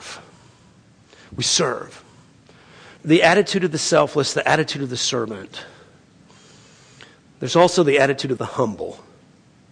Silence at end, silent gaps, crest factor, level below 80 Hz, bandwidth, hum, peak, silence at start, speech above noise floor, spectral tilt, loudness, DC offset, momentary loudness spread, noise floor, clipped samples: 0.75 s; none; 20 dB; -60 dBFS; 10.5 kHz; none; -2 dBFS; 0 s; 33 dB; -3.5 dB/octave; -19 LUFS; under 0.1%; 20 LU; -52 dBFS; under 0.1%